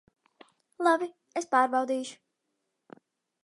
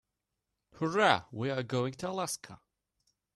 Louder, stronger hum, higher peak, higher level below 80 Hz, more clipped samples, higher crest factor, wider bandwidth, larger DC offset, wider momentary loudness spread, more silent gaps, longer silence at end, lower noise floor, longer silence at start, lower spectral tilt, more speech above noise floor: first, -28 LUFS vs -32 LUFS; neither; about the same, -10 dBFS vs -10 dBFS; second, -86 dBFS vs -70 dBFS; neither; about the same, 22 dB vs 24 dB; second, 11.5 kHz vs 13 kHz; neither; about the same, 11 LU vs 11 LU; neither; first, 1.3 s vs 0.8 s; second, -81 dBFS vs -86 dBFS; about the same, 0.8 s vs 0.75 s; second, -2.5 dB/octave vs -4.5 dB/octave; about the same, 54 dB vs 55 dB